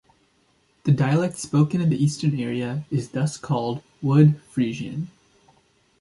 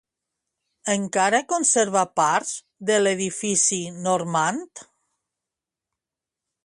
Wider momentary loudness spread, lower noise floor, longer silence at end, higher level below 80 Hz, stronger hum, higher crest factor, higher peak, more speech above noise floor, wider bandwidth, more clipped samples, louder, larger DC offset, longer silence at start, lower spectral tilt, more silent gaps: about the same, 12 LU vs 10 LU; second, -64 dBFS vs -88 dBFS; second, 0.95 s vs 1.8 s; first, -60 dBFS vs -70 dBFS; neither; about the same, 18 dB vs 18 dB; about the same, -4 dBFS vs -6 dBFS; second, 42 dB vs 66 dB; about the same, 11.5 kHz vs 11.5 kHz; neither; about the same, -23 LUFS vs -22 LUFS; neither; about the same, 0.85 s vs 0.85 s; first, -7 dB/octave vs -2.5 dB/octave; neither